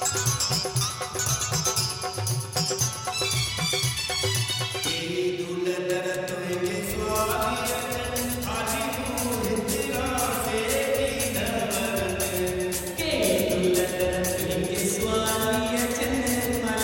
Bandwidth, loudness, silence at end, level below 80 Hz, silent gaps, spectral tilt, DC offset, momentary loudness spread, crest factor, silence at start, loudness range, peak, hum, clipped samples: 17.5 kHz; -25 LUFS; 0 s; -44 dBFS; none; -3.5 dB/octave; under 0.1%; 4 LU; 16 dB; 0 s; 2 LU; -10 dBFS; none; under 0.1%